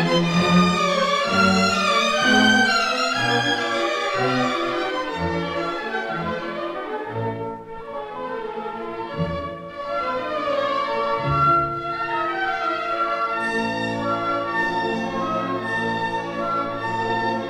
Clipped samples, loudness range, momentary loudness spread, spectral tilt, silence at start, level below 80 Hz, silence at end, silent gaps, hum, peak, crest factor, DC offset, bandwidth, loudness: under 0.1%; 10 LU; 12 LU; -4.5 dB/octave; 0 s; -50 dBFS; 0 s; none; none; -6 dBFS; 16 dB; under 0.1%; 14.5 kHz; -22 LUFS